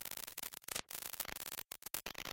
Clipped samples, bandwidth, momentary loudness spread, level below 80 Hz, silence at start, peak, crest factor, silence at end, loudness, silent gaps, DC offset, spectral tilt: under 0.1%; 17 kHz; 3 LU; -70 dBFS; 0 s; -16 dBFS; 30 dB; 0 s; -44 LUFS; none; under 0.1%; -0.5 dB/octave